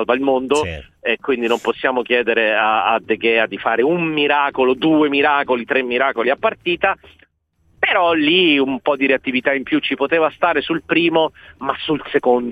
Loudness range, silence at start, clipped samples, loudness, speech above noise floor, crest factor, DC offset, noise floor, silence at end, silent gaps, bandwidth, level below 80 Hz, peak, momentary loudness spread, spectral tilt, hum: 2 LU; 0 s; under 0.1%; -17 LUFS; 43 dB; 16 dB; under 0.1%; -60 dBFS; 0 s; none; 10.5 kHz; -52 dBFS; -2 dBFS; 6 LU; -5 dB/octave; none